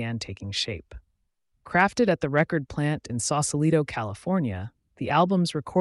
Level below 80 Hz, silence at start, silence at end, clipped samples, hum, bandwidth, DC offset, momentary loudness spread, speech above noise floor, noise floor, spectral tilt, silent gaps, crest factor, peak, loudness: -54 dBFS; 0 s; 0 s; under 0.1%; none; 11.5 kHz; under 0.1%; 10 LU; 48 dB; -73 dBFS; -5 dB/octave; none; 16 dB; -10 dBFS; -25 LUFS